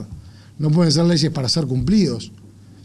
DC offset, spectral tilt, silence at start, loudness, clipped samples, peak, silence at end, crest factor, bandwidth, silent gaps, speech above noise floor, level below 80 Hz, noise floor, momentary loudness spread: under 0.1%; -6 dB/octave; 0 s; -18 LUFS; under 0.1%; -8 dBFS; 0.5 s; 12 dB; 11.5 kHz; none; 21 dB; -42 dBFS; -39 dBFS; 15 LU